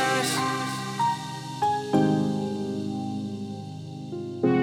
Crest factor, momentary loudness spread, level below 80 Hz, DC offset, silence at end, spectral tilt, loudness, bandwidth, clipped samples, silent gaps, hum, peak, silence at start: 18 dB; 12 LU; -70 dBFS; under 0.1%; 0 s; -5 dB/octave; -27 LUFS; 18.5 kHz; under 0.1%; none; none; -10 dBFS; 0 s